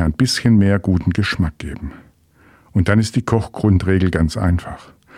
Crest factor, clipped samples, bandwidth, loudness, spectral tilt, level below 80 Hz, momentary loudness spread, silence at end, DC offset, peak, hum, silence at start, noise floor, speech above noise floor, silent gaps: 18 dB; under 0.1%; 13.5 kHz; -17 LUFS; -6.5 dB/octave; -32 dBFS; 15 LU; 0 s; under 0.1%; 0 dBFS; none; 0 s; -51 dBFS; 35 dB; none